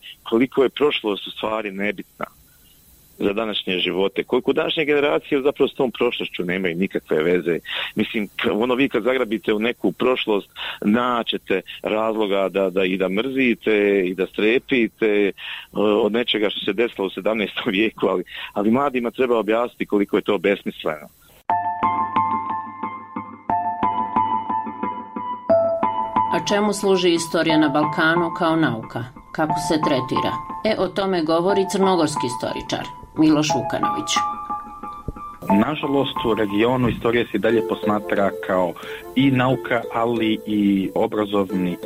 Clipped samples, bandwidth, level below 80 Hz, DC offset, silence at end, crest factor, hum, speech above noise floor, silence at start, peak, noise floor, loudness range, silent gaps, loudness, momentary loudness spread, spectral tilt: under 0.1%; 16 kHz; -52 dBFS; under 0.1%; 0 s; 14 dB; none; 31 dB; 0.05 s; -6 dBFS; -52 dBFS; 4 LU; none; -21 LUFS; 10 LU; -5 dB/octave